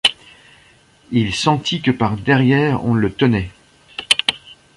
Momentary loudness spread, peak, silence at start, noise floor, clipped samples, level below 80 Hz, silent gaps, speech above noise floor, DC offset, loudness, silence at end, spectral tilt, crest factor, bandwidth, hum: 12 LU; 0 dBFS; 0.05 s; -51 dBFS; under 0.1%; -44 dBFS; none; 35 dB; under 0.1%; -17 LUFS; 0.25 s; -5 dB/octave; 18 dB; 11.5 kHz; none